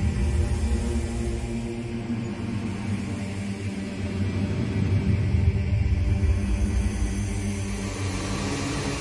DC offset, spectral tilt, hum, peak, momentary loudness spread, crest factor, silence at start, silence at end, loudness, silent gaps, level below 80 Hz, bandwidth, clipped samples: under 0.1%; -6.5 dB/octave; none; -10 dBFS; 7 LU; 16 dB; 0 s; 0 s; -27 LUFS; none; -32 dBFS; 11.5 kHz; under 0.1%